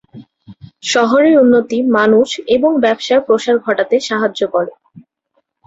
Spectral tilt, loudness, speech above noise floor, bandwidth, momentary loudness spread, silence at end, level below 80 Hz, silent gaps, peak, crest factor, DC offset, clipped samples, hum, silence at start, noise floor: -4 dB/octave; -13 LUFS; 53 dB; 8 kHz; 7 LU; 0.65 s; -58 dBFS; none; -2 dBFS; 12 dB; under 0.1%; under 0.1%; none; 0.15 s; -65 dBFS